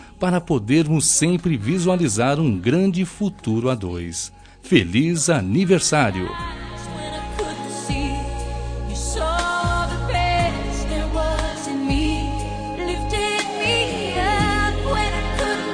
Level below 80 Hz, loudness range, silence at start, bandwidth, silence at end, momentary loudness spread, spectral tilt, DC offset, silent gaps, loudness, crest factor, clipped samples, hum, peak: -30 dBFS; 5 LU; 0 s; 10.5 kHz; 0 s; 11 LU; -4.5 dB/octave; under 0.1%; none; -21 LUFS; 18 dB; under 0.1%; none; -2 dBFS